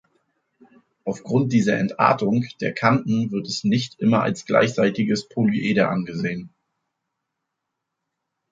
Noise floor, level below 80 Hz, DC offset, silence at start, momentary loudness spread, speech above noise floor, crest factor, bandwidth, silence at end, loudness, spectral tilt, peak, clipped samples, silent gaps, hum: -81 dBFS; -62 dBFS; under 0.1%; 1.05 s; 8 LU; 60 dB; 22 dB; 7.8 kHz; 2.05 s; -21 LUFS; -6.5 dB/octave; -2 dBFS; under 0.1%; none; none